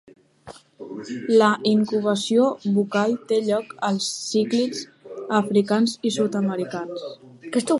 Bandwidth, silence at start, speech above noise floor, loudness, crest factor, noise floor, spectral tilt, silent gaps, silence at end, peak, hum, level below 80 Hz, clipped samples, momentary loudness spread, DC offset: 11.5 kHz; 0.45 s; 24 dB; -22 LUFS; 18 dB; -46 dBFS; -5 dB/octave; none; 0 s; -4 dBFS; none; -70 dBFS; under 0.1%; 16 LU; under 0.1%